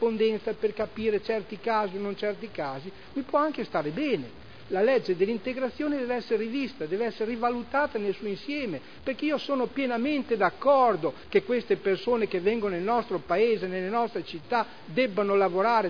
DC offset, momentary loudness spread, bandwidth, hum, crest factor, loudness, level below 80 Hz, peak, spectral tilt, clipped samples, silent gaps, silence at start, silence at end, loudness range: 0.4%; 8 LU; 5.4 kHz; none; 18 dB; -28 LUFS; -60 dBFS; -10 dBFS; -7 dB/octave; under 0.1%; none; 0 s; 0 s; 4 LU